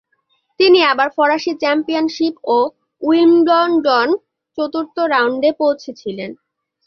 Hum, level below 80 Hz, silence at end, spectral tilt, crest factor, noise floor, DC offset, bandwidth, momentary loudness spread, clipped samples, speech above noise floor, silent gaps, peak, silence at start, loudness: none; -64 dBFS; 0.55 s; -4.5 dB/octave; 14 dB; -64 dBFS; under 0.1%; 6.6 kHz; 14 LU; under 0.1%; 50 dB; none; -2 dBFS; 0.6 s; -15 LUFS